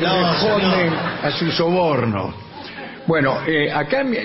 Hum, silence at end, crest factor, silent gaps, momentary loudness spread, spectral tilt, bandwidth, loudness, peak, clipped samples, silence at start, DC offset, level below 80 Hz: none; 0 s; 14 dB; none; 13 LU; -9 dB/octave; 5.8 kHz; -18 LUFS; -6 dBFS; under 0.1%; 0 s; under 0.1%; -50 dBFS